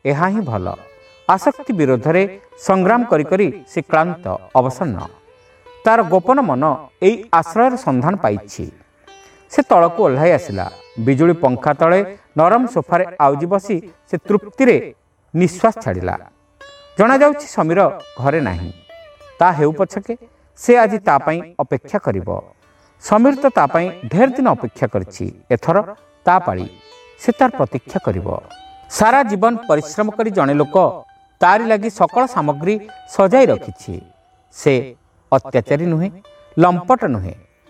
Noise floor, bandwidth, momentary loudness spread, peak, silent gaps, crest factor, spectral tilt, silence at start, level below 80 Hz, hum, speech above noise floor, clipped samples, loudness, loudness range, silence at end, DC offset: -47 dBFS; 14 kHz; 13 LU; 0 dBFS; none; 16 dB; -7 dB/octave; 0.05 s; -50 dBFS; none; 32 dB; under 0.1%; -16 LUFS; 3 LU; 0.35 s; under 0.1%